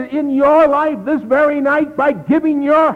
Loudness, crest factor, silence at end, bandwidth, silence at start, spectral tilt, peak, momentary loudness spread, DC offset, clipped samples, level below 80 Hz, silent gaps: -14 LUFS; 10 dB; 0 s; 6.2 kHz; 0 s; -7.5 dB/octave; -2 dBFS; 6 LU; under 0.1%; under 0.1%; -50 dBFS; none